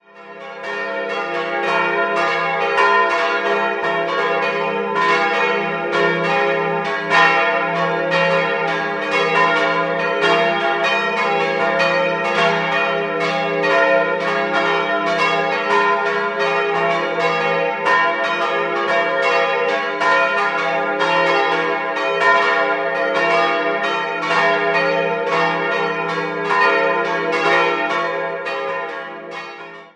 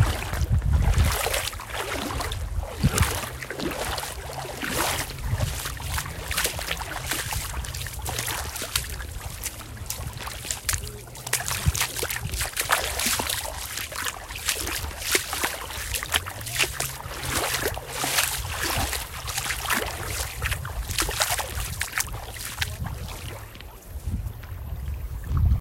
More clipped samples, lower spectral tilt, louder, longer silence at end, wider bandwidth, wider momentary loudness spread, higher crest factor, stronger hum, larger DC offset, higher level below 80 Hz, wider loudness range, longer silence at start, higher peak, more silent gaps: neither; first, -4 dB/octave vs -2.5 dB/octave; first, -17 LUFS vs -27 LUFS; about the same, 0.05 s vs 0 s; second, 10.5 kHz vs 16.5 kHz; second, 6 LU vs 11 LU; second, 16 dB vs 26 dB; neither; neither; second, -66 dBFS vs -34 dBFS; second, 1 LU vs 4 LU; first, 0.15 s vs 0 s; about the same, -2 dBFS vs -2 dBFS; neither